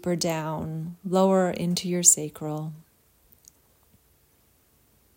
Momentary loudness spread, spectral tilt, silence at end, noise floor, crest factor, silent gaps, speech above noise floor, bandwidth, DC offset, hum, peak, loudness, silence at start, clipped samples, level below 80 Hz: 16 LU; -4 dB/octave; 2.35 s; -63 dBFS; 26 dB; none; 38 dB; 16.5 kHz; under 0.1%; none; -2 dBFS; -24 LUFS; 0.05 s; under 0.1%; -62 dBFS